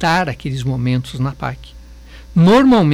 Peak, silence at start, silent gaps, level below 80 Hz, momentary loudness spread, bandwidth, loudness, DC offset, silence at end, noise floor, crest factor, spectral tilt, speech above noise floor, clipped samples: -6 dBFS; 0 s; none; -38 dBFS; 16 LU; 13 kHz; -16 LUFS; under 0.1%; 0 s; -37 dBFS; 10 dB; -7 dB/octave; 23 dB; under 0.1%